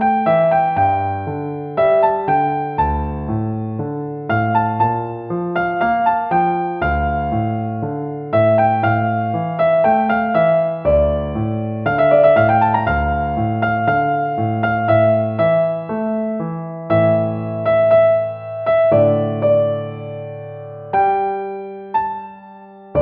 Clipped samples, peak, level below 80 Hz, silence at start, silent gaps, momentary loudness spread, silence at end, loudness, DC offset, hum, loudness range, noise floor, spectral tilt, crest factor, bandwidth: under 0.1%; -2 dBFS; -36 dBFS; 0 s; none; 11 LU; 0 s; -17 LUFS; under 0.1%; none; 4 LU; -39 dBFS; -6.5 dB/octave; 16 dB; 4.5 kHz